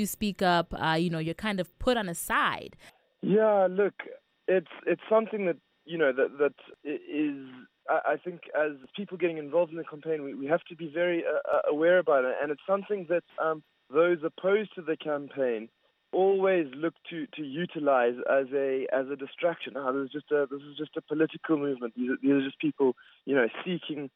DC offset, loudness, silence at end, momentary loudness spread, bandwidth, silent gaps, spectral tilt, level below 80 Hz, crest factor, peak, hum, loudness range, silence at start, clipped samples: under 0.1%; -29 LUFS; 0.1 s; 12 LU; 14.5 kHz; none; -5.5 dB/octave; -60 dBFS; 18 dB; -12 dBFS; none; 3 LU; 0 s; under 0.1%